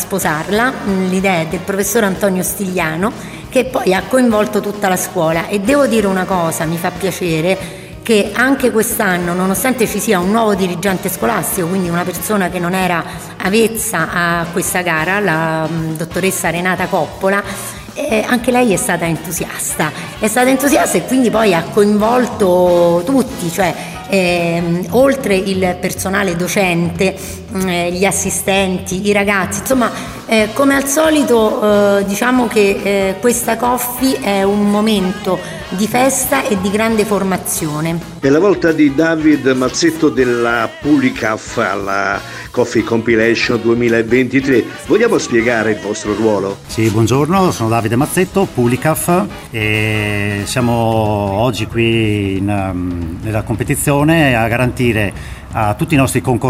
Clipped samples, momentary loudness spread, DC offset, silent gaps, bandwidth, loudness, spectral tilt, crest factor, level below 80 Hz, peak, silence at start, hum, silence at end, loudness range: under 0.1%; 7 LU; under 0.1%; none; 16 kHz; -14 LUFS; -5 dB/octave; 14 dB; -38 dBFS; 0 dBFS; 0 s; none; 0 s; 3 LU